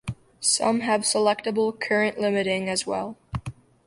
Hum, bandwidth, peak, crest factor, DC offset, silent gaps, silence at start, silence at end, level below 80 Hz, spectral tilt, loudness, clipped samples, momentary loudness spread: none; 11.5 kHz; -6 dBFS; 18 dB; under 0.1%; none; 0.05 s; 0.35 s; -52 dBFS; -3 dB/octave; -24 LUFS; under 0.1%; 14 LU